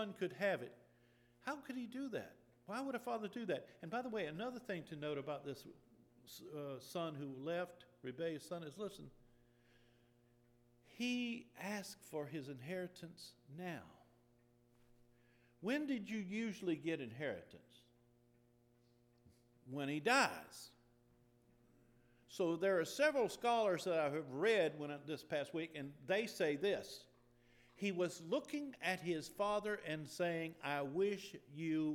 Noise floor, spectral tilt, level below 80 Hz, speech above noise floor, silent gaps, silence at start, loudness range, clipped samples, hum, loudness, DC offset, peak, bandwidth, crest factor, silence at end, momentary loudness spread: -73 dBFS; -5 dB/octave; -80 dBFS; 31 dB; none; 0 s; 10 LU; under 0.1%; none; -42 LUFS; under 0.1%; -22 dBFS; 19.5 kHz; 22 dB; 0 s; 16 LU